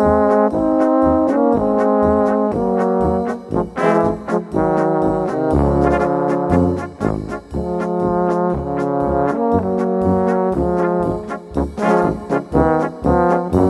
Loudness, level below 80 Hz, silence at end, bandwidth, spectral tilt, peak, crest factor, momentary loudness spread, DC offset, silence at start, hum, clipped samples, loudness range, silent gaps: -17 LUFS; -32 dBFS; 0 s; 11.5 kHz; -9 dB/octave; -2 dBFS; 14 dB; 7 LU; under 0.1%; 0 s; none; under 0.1%; 3 LU; none